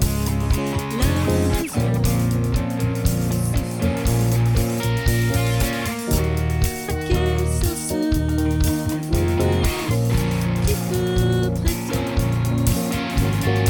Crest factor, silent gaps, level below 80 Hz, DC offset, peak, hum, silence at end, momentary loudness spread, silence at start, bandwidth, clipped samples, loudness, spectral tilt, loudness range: 16 dB; none; -26 dBFS; under 0.1%; -4 dBFS; none; 0 s; 3 LU; 0 s; 19.5 kHz; under 0.1%; -21 LUFS; -6 dB/octave; 1 LU